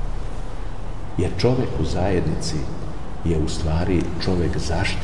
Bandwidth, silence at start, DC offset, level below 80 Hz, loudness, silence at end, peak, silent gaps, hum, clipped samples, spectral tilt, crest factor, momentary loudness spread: 11.5 kHz; 0 s; 5%; -30 dBFS; -24 LUFS; 0 s; -6 dBFS; none; none; under 0.1%; -6 dB/octave; 16 dB; 13 LU